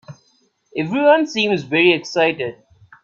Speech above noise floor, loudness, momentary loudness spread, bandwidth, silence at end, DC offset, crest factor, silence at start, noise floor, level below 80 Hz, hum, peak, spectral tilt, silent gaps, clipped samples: 44 dB; -17 LUFS; 12 LU; 7.4 kHz; 0.5 s; under 0.1%; 18 dB; 0.1 s; -61 dBFS; -64 dBFS; none; 0 dBFS; -5 dB/octave; none; under 0.1%